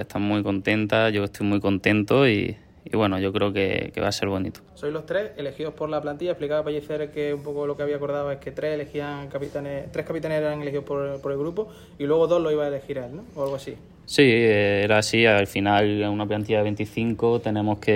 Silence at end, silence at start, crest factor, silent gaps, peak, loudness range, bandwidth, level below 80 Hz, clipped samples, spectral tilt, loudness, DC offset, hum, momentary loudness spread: 0 s; 0 s; 20 dB; none; -4 dBFS; 8 LU; 16 kHz; -54 dBFS; under 0.1%; -6 dB/octave; -24 LUFS; under 0.1%; none; 13 LU